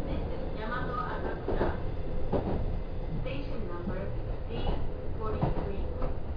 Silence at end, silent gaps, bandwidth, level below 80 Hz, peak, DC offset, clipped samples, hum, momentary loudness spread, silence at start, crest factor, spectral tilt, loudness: 0 s; none; 5.2 kHz; -34 dBFS; -16 dBFS; under 0.1%; under 0.1%; none; 6 LU; 0 s; 16 dB; -9.5 dB/octave; -35 LUFS